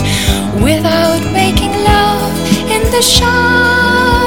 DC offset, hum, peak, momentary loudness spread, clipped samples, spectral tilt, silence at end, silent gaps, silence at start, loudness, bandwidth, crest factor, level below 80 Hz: 3%; none; 0 dBFS; 5 LU; 0.3%; -4 dB/octave; 0 s; none; 0 s; -10 LUFS; over 20 kHz; 10 dB; -22 dBFS